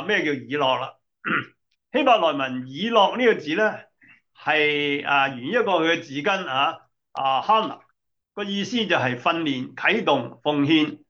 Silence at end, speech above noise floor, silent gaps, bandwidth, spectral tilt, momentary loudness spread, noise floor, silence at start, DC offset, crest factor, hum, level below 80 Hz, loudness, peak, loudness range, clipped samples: 0.1 s; 51 dB; none; 7.4 kHz; -5 dB/octave; 12 LU; -73 dBFS; 0 s; under 0.1%; 18 dB; none; -76 dBFS; -22 LUFS; -4 dBFS; 3 LU; under 0.1%